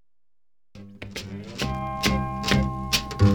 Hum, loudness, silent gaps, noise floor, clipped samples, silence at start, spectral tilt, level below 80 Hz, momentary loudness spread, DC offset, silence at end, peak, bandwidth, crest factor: none; -26 LUFS; none; -90 dBFS; under 0.1%; 0.75 s; -5 dB/octave; -38 dBFS; 14 LU; 0.2%; 0 s; -6 dBFS; 19 kHz; 20 dB